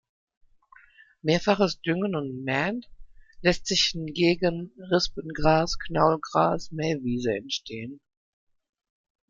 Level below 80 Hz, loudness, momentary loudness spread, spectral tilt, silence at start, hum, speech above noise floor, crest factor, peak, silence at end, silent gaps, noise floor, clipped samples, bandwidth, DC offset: -46 dBFS; -25 LUFS; 9 LU; -4.5 dB/octave; 1.25 s; none; 31 dB; 22 dB; -6 dBFS; 1.35 s; none; -56 dBFS; under 0.1%; 7.8 kHz; under 0.1%